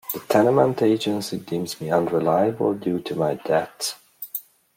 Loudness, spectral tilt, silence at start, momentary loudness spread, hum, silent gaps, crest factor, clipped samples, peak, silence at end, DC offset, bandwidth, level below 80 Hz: -22 LUFS; -5.5 dB/octave; 0.1 s; 13 LU; none; none; 18 dB; under 0.1%; -4 dBFS; 0.35 s; under 0.1%; 16.5 kHz; -64 dBFS